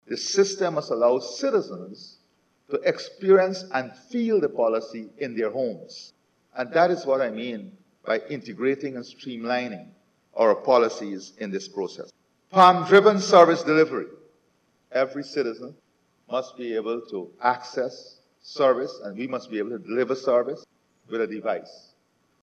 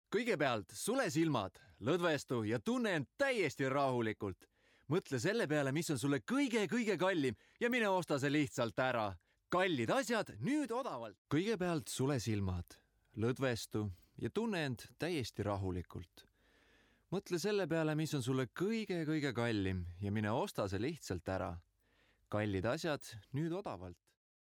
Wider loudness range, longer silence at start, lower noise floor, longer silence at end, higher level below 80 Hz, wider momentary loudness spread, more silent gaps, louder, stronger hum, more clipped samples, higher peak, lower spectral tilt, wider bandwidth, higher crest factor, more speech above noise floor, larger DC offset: first, 10 LU vs 5 LU; about the same, 0.1 s vs 0.1 s; second, -68 dBFS vs -74 dBFS; first, 0.75 s vs 0.6 s; second, -86 dBFS vs -68 dBFS; first, 20 LU vs 9 LU; second, none vs 11.18-11.25 s; first, -23 LUFS vs -38 LUFS; neither; neither; first, -2 dBFS vs -22 dBFS; about the same, -4.5 dB/octave vs -5.5 dB/octave; second, 9.4 kHz vs 17 kHz; first, 24 dB vs 16 dB; first, 44 dB vs 37 dB; neither